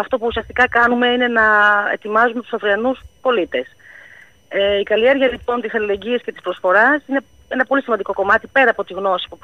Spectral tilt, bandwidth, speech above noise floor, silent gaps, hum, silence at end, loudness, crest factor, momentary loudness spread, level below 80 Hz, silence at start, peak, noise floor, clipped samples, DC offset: -5 dB/octave; 9.4 kHz; 28 dB; none; none; 0.1 s; -17 LUFS; 14 dB; 10 LU; -48 dBFS; 0 s; -2 dBFS; -45 dBFS; under 0.1%; 0.2%